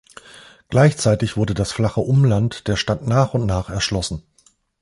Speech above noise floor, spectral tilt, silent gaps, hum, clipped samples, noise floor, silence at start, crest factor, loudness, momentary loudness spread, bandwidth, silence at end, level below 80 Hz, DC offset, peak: 40 dB; -6 dB/octave; none; none; under 0.1%; -58 dBFS; 0.35 s; 16 dB; -19 LUFS; 7 LU; 11.5 kHz; 0.65 s; -38 dBFS; under 0.1%; -2 dBFS